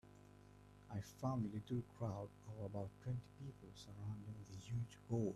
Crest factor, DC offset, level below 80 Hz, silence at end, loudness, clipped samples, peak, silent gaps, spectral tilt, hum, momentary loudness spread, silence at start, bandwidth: 18 dB; under 0.1%; -70 dBFS; 0 s; -48 LUFS; under 0.1%; -28 dBFS; none; -8 dB/octave; 50 Hz at -60 dBFS; 20 LU; 0.05 s; 13 kHz